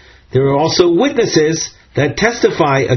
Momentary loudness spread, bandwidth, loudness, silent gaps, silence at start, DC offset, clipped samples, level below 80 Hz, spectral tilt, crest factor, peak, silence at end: 7 LU; 6.6 kHz; -14 LUFS; none; 0.35 s; under 0.1%; under 0.1%; -42 dBFS; -4.5 dB/octave; 14 dB; 0 dBFS; 0 s